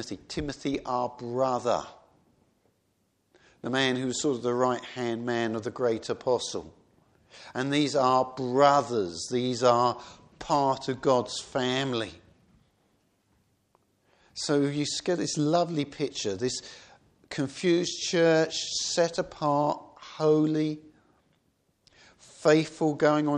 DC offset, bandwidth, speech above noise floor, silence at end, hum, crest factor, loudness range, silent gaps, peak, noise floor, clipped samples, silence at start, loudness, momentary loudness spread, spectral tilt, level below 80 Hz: under 0.1%; 10.5 kHz; 46 dB; 0 s; none; 22 dB; 7 LU; none; -6 dBFS; -72 dBFS; under 0.1%; 0 s; -27 LUFS; 12 LU; -4.5 dB/octave; -62 dBFS